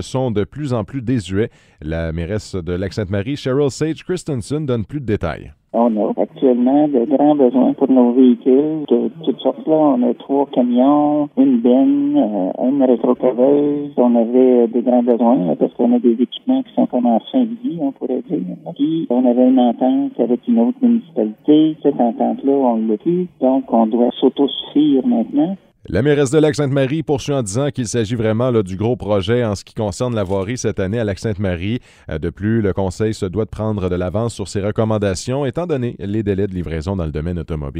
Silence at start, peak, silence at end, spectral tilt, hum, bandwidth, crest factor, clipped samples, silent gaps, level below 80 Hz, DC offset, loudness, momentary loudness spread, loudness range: 0 s; 0 dBFS; 0 s; -7 dB/octave; none; 11 kHz; 16 dB; under 0.1%; none; -42 dBFS; under 0.1%; -17 LUFS; 9 LU; 6 LU